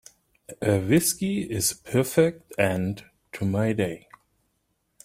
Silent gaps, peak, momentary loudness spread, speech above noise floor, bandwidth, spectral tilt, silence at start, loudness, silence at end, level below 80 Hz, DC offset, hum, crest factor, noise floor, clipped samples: none; -6 dBFS; 10 LU; 49 dB; 16 kHz; -5 dB/octave; 0.5 s; -25 LUFS; 1.05 s; -58 dBFS; under 0.1%; none; 20 dB; -73 dBFS; under 0.1%